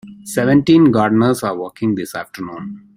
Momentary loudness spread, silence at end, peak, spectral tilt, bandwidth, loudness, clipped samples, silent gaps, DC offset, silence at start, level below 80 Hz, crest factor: 17 LU; 0.2 s; -2 dBFS; -6.5 dB/octave; 16 kHz; -15 LUFS; under 0.1%; none; under 0.1%; 0.05 s; -52 dBFS; 14 dB